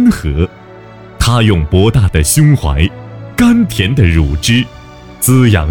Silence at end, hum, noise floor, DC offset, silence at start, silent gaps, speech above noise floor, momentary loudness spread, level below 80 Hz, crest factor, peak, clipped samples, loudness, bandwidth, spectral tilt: 0 s; none; -33 dBFS; under 0.1%; 0 s; none; 24 dB; 8 LU; -22 dBFS; 10 dB; 0 dBFS; under 0.1%; -11 LUFS; 19 kHz; -5.5 dB/octave